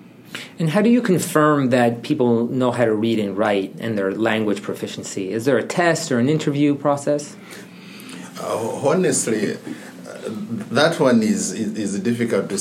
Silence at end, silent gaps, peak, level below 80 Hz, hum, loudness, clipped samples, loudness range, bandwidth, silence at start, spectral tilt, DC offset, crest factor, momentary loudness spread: 0 s; none; -2 dBFS; -74 dBFS; none; -20 LUFS; under 0.1%; 5 LU; 16 kHz; 0 s; -5 dB/octave; under 0.1%; 18 dB; 18 LU